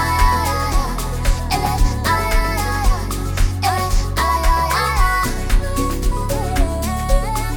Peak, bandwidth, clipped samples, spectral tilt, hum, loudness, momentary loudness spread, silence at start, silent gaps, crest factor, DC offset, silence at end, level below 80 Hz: -2 dBFS; 19.5 kHz; under 0.1%; -4.5 dB/octave; none; -19 LUFS; 5 LU; 0 s; none; 16 dB; under 0.1%; 0 s; -20 dBFS